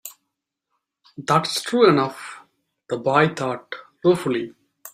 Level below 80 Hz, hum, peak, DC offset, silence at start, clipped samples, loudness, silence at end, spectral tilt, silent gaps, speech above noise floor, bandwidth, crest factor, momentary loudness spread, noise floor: -64 dBFS; none; -2 dBFS; under 0.1%; 0.05 s; under 0.1%; -21 LUFS; 0.05 s; -5 dB/octave; none; 59 dB; 16 kHz; 20 dB; 20 LU; -80 dBFS